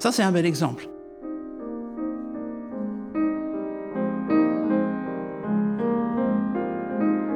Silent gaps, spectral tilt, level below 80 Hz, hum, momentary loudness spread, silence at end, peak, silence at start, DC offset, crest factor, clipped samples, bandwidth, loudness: none; -6 dB/octave; -60 dBFS; none; 13 LU; 0 s; -8 dBFS; 0 s; under 0.1%; 18 dB; under 0.1%; 15.5 kHz; -26 LUFS